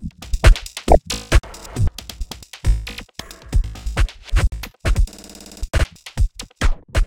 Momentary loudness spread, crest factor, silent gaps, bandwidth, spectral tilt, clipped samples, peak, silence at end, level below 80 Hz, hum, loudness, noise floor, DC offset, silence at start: 16 LU; 18 dB; none; 16.5 kHz; -5 dB/octave; under 0.1%; 0 dBFS; 0 s; -20 dBFS; none; -22 LUFS; -39 dBFS; under 0.1%; 0 s